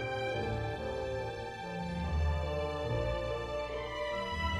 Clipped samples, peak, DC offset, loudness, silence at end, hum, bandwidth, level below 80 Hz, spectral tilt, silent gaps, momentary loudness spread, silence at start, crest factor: under 0.1%; -22 dBFS; under 0.1%; -36 LUFS; 0 s; none; 11 kHz; -42 dBFS; -6 dB/octave; none; 5 LU; 0 s; 14 dB